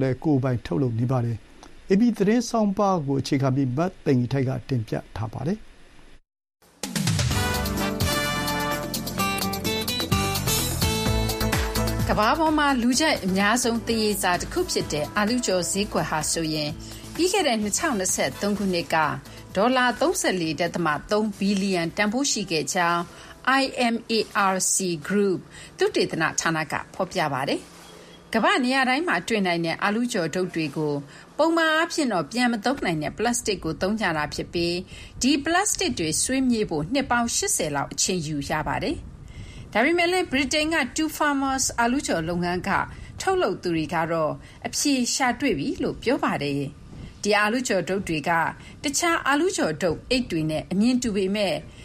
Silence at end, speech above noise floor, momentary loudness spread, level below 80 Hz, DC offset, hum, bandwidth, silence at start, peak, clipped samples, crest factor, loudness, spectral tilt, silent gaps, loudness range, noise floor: 0 s; 23 dB; 7 LU; -42 dBFS; under 0.1%; none; 15.5 kHz; 0 s; -6 dBFS; under 0.1%; 18 dB; -24 LUFS; -4 dB/octave; none; 3 LU; -47 dBFS